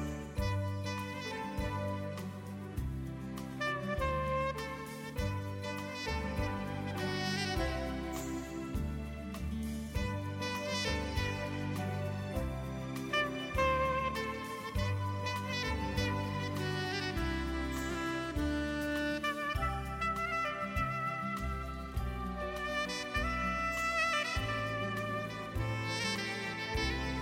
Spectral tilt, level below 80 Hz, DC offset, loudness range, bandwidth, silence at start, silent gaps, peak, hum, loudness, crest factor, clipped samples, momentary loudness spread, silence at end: -5 dB/octave; -44 dBFS; under 0.1%; 4 LU; 16 kHz; 0 s; none; -20 dBFS; none; -36 LUFS; 16 dB; under 0.1%; 7 LU; 0 s